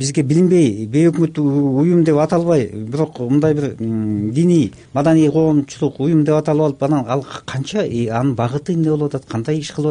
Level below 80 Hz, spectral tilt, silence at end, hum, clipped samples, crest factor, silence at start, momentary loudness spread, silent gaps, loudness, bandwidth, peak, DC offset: -50 dBFS; -7.5 dB/octave; 0 s; none; under 0.1%; 12 dB; 0 s; 8 LU; none; -17 LUFS; 10 kHz; -4 dBFS; under 0.1%